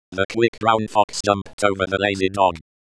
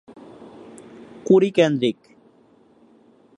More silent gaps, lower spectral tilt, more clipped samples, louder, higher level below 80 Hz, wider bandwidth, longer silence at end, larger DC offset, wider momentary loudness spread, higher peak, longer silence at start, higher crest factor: first, 0.25-0.29 s, 0.48-0.53 s, 1.04-1.08 s, 1.53-1.58 s vs none; second, -4.5 dB/octave vs -6.5 dB/octave; neither; about the same, -20 LUFS vs -18 LUFS; first, -52 dBFS vs -70 dBFS; about the same, 11 kHz vs 10.5 kHz; second, 0.3 s vs 1.45 s; neither; second, 3 LU vs 27 LU; about the same, -2 dBFS vs -4 dBFS; second, 0.1 s vs 1.25 s; about the same, 18 dB vs 20 dB